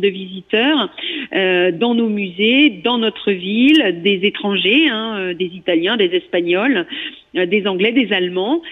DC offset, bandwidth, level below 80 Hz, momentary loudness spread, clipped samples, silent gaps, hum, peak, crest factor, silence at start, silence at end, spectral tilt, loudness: under 0.1%; 6.4 kHz; -62 dBFS; 9 LU; under 0.1%; none; none; -4 dBFS; 12 dB; 0 s; 0 s; -6.5 dB/octave; -16 LUFS